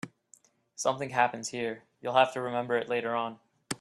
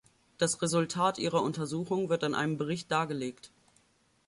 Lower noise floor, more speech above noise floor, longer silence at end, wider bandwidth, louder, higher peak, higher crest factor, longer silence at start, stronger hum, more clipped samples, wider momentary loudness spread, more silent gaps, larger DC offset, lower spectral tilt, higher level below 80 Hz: second, -63 dBFS vs -69 dBFS; second, 33 dB vs 38 dB; second, 0.05 s vs 0.8 s; first, 13 kHz vs 11.5 kHz; about the same, -30 LUFS vs -31 LUFS; first, -8 dBFS vs -14 dBFS; first, 24 dB vs 18 dB; second, 0.05 s vs 0.4 s; neither; neither; first, 13 LU vs 7 LU; neither; neither; about the same, -3.5 dB/octave vs -4.5 dB/octave; about the same, -74 dBFS vs -70 dBFS